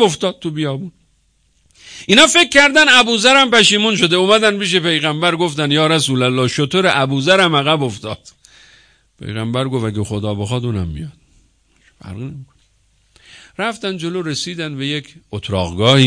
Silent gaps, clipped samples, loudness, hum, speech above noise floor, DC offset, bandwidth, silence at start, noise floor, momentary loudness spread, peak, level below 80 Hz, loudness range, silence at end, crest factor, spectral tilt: none; under 0.1%; -14 LUFS; none; 44 dB; under 0.1%; 11 kHz; 0 s; -59 dBFS; 20 LU; 0 dBFS; -46 dBFS; 16 LU; 0 s; 16 dB; -3.5 dB/octave